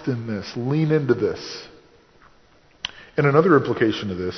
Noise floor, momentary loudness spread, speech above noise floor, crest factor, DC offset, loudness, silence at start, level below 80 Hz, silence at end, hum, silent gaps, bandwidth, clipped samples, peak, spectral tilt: -55 dBFS; 16 LU; 34 dB; 22 dB; under 0.1%; -21 LUFS; 0 s; -52 dBFS; 0 s; none; none; 6.4 kHz; under 0.1%; -2 dBFS; -7 dB/octave